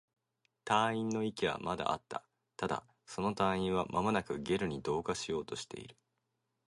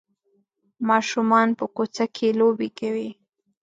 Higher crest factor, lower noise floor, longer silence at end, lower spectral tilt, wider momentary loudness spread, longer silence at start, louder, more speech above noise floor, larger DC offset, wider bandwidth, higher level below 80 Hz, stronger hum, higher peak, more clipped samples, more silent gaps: first, 24 dB vs 18 dB; first, -84 dBFS vs -68 dBFS; first, 0.75 s vs 0.5 s; about the same, -5 dB/octave vs -5 dB/octave; first, 14 LU vs 10 LU; second, 0.65 s vs 0.8 s; second, -35 LUFS vs -22 LUFS; about the same, 49 dB vs 47 dB; neither; first, 11.5 kHz vs 7.8 kHz; first, -62 dBFS vs -74 dBFS; neither; second, -14 dBFS vs -4 dBFS; neither; neither